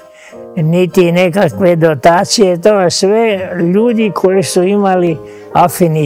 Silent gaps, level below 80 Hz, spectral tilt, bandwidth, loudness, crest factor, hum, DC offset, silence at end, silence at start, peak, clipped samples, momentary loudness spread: none; -48 dBFS; -5.5 dB/octave; 16.5 kHz; -11 LUFS; 10 dB; none; under 0.1%; 0 s; 0.3 s; 0 dBFS; 1%; 5 LU